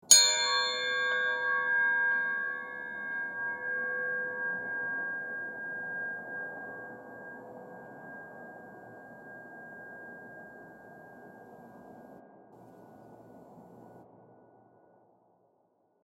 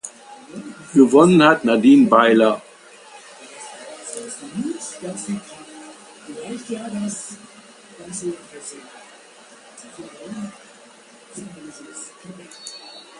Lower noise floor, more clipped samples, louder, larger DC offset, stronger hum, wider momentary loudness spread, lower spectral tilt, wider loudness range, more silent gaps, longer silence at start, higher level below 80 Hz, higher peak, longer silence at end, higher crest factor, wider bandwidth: first, -72 dBFS vs -47 dBFS; neither; second, -29 LUFS vs -17 LUFS; neither; neither; second, 24 LU vs 27 LU; second, 1 dB/octave vs -5 dB/octave; about the same, 23 LU vs 22 LU; neither; about the same, 0.05 s vs 0.05 s; second, -82 dBFS vs -66 dBFS; second, -4 dBFS vs 0 dBFS; first, 1.9 s vs 0.2 s; first, 30 dB vs 20 dB; first, 16.5 kHz vs 11.5 kHz